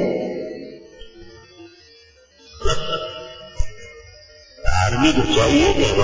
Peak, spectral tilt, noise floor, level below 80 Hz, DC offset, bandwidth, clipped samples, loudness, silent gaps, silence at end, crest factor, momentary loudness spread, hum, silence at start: -4 dBFS; -4.5 dB/octave; -50 dBFS; -32 dBFS; under 0.1%; 7.6 kHz; under 0.1%; -20 LUFS; none; 0 s; 18 dB; 25 LU; none; 0 s